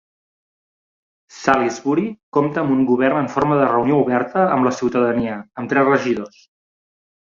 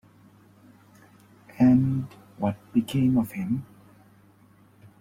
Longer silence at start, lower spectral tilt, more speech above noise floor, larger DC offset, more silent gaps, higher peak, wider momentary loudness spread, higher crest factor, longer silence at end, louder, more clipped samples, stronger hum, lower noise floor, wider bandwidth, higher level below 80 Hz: second, 1.35 s vs 1.6 s; second, -6.5 dB/octave vs -8.5 dB/octave; first, over 72 dB vs 32 dB; neither; first, 2.23-2.32 s vs none; first, 0 dBFS vs -10 dBFS; second, 7 LU vs 12 LU; about the same, 18 dB vs 18 dB; second, 1.1 s vs 1.35 s; first, -18 LUFS vs -25 LUFS; neither; neither; first, under -90 dBFS vs -57 dBFS; second, 7.6 kHz vs 16 kHz; about the same, -56 dBFS vs -56 dBFS